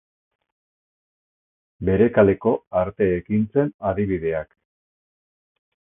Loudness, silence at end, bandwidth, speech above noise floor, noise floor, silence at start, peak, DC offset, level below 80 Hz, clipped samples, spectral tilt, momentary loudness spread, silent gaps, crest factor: -21 LUFS; 1.4 s; 3.7 kHz; over 70 dB; under -90 dBFS; 1.8 s; -2 dBFS; under 0.1%; -46 dBFS; under 0.1%; -12.5 dB/octave; 10 LU; 2.67-2.71 s, 3.74-3.79 s; 22 dB